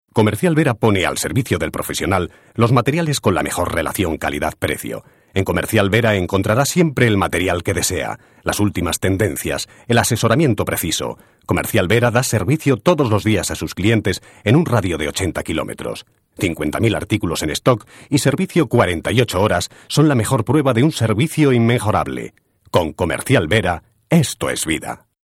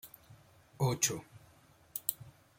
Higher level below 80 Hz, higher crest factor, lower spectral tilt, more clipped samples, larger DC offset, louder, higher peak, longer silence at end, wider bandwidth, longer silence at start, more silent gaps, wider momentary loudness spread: first, -42 dBFS vs -70 dBFS; second, 18 dB vs 30 dB; first, -5 dB/octave vs -3.5 dB/octave; neither; neither; first, -18 LUFS vs -35 LUFS; first, 0 dBFS vs -10 dBFS; about the same, 0.3 s vs 0.3 s; about the same, 17 kHz vs 16.5 kHz; about the same, 0.15 s vs 0.05 s; neither; second, 8 LU vs 22 LU